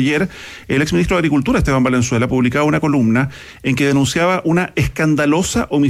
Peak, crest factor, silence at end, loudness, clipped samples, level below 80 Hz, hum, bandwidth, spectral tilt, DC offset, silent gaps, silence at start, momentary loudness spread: -4 dBFS; 10 dB; 0 s; -16 LUFS; under 0.1%; -34 dBFS; none; 15 kHz; -5.5 dB/octave; under 0.1%; none; 0 s; 5 LU